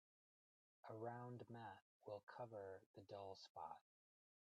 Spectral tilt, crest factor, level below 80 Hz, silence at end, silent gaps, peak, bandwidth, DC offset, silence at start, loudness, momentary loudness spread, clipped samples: -6.5 dB/octave; 18 dB; under -90 dBFS; 0.8 s; 1.82-2.00 s, 2.23-2.27 s, 2.86-2.94 s, 3.49-3.55 s; -40 dBFS; 8.8 kHz; under 0.1%; 0.85 s; -57 LUFS; 8 LU; under 0.1%